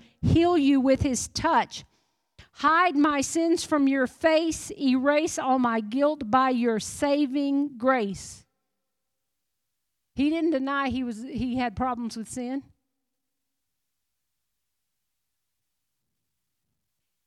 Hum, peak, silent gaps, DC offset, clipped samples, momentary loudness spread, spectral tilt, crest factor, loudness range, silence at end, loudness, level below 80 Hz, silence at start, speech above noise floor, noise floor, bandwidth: none; -10 dBFS; none; under 0.1%; under 0.1%; 12 LU; -5 dB/octave; 18 dB; 10 LU; 4.65 s; -25 LUFS; -52 dBFS; 0.2 s; 59 dB; -84 dBFS; 13 kHz